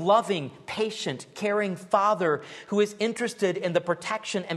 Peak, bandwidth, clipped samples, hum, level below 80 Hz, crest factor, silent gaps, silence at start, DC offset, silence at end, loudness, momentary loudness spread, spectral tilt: -8 dBFS; 12.5 kHz; under 0.1%; none; -74 dBFS; 18 dB; none; 0 s; under 0.1%; 0 s; -27 LUFS; 8 LU; -4.5 dB/octave